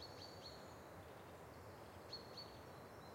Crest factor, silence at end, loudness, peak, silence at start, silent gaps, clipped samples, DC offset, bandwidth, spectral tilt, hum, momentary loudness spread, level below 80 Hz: 16 dB; 0 s; -56 LUFS; -40 dBFS; 0 s; none; under 0.1%; under 0.1%; 16.5 kHz; -4.5 dB/octave; none; 5 LU; -74 dBFS